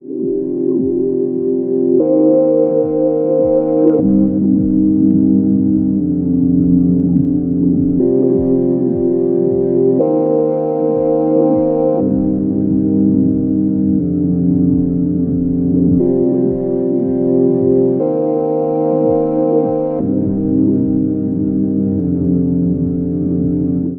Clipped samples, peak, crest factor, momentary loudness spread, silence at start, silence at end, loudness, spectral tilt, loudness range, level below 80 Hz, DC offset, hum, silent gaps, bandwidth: under 0.1%; 0 dBFS; 12 dB; 4 LU; 0.05 s; 0 s; -14 LUFS; -15.5 dB/octave; 2 LU; -40 dBFS; under 0.1%; none; none; 2.1 kHz